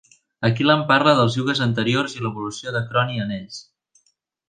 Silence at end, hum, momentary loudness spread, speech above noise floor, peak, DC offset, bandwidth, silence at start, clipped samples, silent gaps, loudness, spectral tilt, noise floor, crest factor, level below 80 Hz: 0.85 s; none; 13 LU; 47 dB; -2 dBFS; under 0.1%; 9.6 kHz; 0.4 s; under 0.1%; none; -20 LUFS; -5.5 dB/octave; -67 dBFS; 20 dB; -58 dBFS